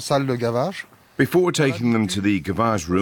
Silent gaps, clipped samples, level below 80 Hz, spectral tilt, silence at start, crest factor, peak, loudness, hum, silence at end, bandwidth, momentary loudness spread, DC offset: none; under 0.1%; -50 dBFS; -5.5 dB/octave; 0 s; 16 dB; -6 dBFS; -21 LUFS; none; 0 s; 19 kHz; 7 LU; under 0.1%